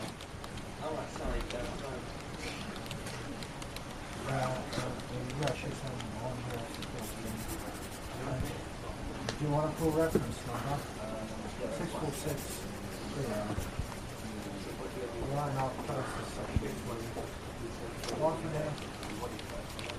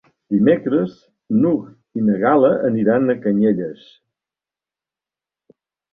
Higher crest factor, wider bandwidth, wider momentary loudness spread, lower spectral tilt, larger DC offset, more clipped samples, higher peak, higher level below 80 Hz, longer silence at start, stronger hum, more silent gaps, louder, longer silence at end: about the same, 22 dB vs 18 dB; first, 15.5 kHz vs 4.6 kHz; about the same, 9 LU vs 9 LU; second, -5 dB/octave vs -10.5 dB/octave; neither; neither; second, -14 dBFS vs -2 dBFS; first, -48 dBFS vs -60 dBFS; second, 0 s vs 0.3 s; neither; neither; second, -38 LUFS vs -18 LUFS; second, 0 s vs 2.2 s